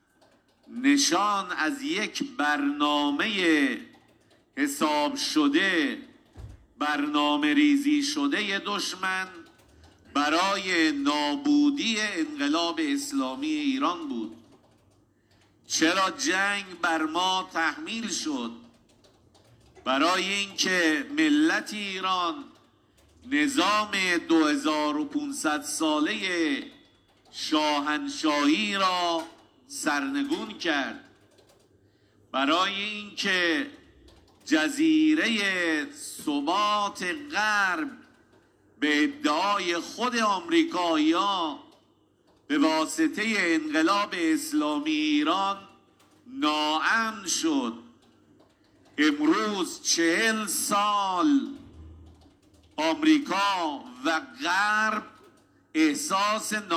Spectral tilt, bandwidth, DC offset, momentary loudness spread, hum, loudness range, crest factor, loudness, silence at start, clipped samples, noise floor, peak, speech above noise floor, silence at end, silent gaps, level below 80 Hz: -2.5 dB/octave; 15.5 kHz; under 0.1%; 9 LU; none; 3 LU; 18 dB; -25 LUFS; 0.7 s; under 0.1%; -64 dBFS; -10 dBFS; 38 dB; 0 s; none; -66 dBFS